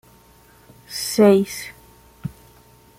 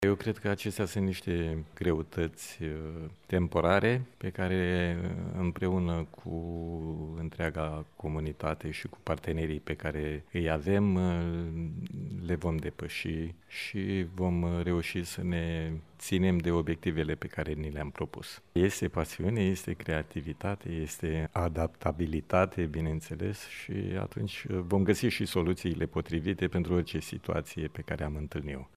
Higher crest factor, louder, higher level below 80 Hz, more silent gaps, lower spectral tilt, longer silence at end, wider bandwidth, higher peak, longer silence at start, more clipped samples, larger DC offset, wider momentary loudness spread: about the same, 20 dB vs 22 dB; first, -18 LUFS vs -33 LUFS; second, -56 dBFS vs -46 dBFS; neither; second, -5 dB/octave vs -6.5 dB/octave; first, 0.7 s vs 0.1 s; about the same, 16 kHz vs 15 kHz; first, -4 dBFS vs -10 dBFS; first, 0.9 s vs 0 s; neither; neither; first, 21 LU vs 10 LU